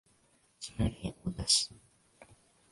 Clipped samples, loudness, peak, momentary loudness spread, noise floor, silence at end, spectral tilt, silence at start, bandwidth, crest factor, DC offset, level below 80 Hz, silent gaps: under 0.1%; -31 LUFS; -12 dBFS; 16 LU; -69 dBFS; 0.5 s; -3 dB/octave; 0.6 s; 11.5 kHz; 26 dB; under 0.1%; -50 dBFS; none